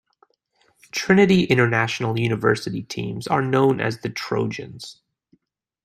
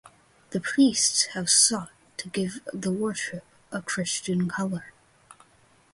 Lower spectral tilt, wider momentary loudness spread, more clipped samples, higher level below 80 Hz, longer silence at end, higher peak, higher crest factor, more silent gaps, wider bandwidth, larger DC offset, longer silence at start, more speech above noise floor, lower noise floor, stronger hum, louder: first, -6 dB/octave vs -2.5 dB/octave; second, 14 LU vs 17 LU; neither; first, -58 dBFS vs -66 dBFS; second, 0.9 s vs 1.05 s; first, -2 dBFS vs -6 dBFS; about the same, 20 dB vs 20 dB; neither; first, 14.5 kHz vs 11.5 kHz; neither; first, 0.95 s vs 0.05 s; first, 48 dB vs 35 dB; first, -68 dBFS vs -60 dBFS; neither; first, -21 LUFS vs -25 LUFS